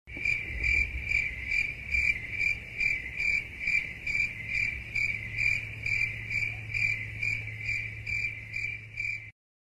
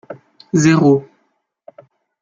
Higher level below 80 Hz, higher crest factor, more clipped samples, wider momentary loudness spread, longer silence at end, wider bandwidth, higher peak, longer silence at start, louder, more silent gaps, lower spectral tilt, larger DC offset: first, -46 dBFS vs -58 dBFS; about the same, 16 dB vs 16 dB; neither; second, 6 LU vs 25 LU; second, 0.3 s vs 1.2 s; first, 15 kHz vs 9 kHz; second, -14 dBFS vs -2 dBFS; about the same, 0.05 s vs 0.1 s; second, -29 LUFS vs -14 LUFS; neither; second, -3.5 dB/octave vs -6.5 dB/octave; neither